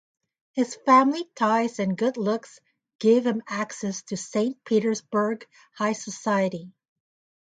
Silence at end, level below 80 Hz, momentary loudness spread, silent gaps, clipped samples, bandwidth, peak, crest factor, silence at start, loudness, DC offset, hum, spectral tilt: 0.75 s; -74 dBFS; 12 LU; 2.95-2.99 s; under 0.1%; 9.4 kHz; -6 dBFS; 20 dB; 0.55 s; -25 LUFS; under 0.1%; none; -5 dB/octave